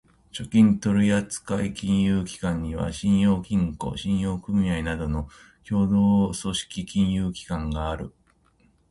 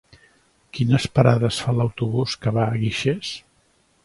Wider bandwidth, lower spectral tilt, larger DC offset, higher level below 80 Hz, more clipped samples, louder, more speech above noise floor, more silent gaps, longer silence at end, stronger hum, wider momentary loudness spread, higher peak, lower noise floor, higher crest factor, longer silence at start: about the same, 11.5 kHz vs 11.5 kHz; about the same, -6 dB/octave vs -6.5 dB/octave; neither; first, -40 dBFS vs -50 dBFS; neither; second, -24 LUFS vs -21 LUFS; about the same, 39 dB vs 42 dB; neither; first, 0.8 s vs 0.65 s; neither; about the same, 11 LU vs 11 LU; second, -8 dBFS vs 0 dBFS; about the same, -62 dBFS vs -62 dBFS; second, 16 dB vs 22 dB; second, 0.35 s vs 0.75 s